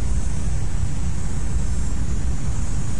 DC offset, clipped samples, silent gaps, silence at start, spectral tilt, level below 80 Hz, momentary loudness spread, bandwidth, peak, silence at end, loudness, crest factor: 10%; under 0.1%; none; 0 s; -5.5 dB/octave; -26 dBFS; 1 LU; 11.5 kHz; -10 dBFS; 0 s; -27 LUFS; 12 dB